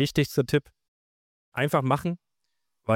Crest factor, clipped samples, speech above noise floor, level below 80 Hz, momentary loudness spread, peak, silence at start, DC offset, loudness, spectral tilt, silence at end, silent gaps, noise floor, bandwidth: 18 dB; under 0.1%; 57 dB; -56 dBFS; 13 LU; -10 dBFS; 0 s; under 0.1%; -26 LUFS; -6 dB/octave; 0 s; 0.88-1.52 s; -82 dBFS; 17 kHz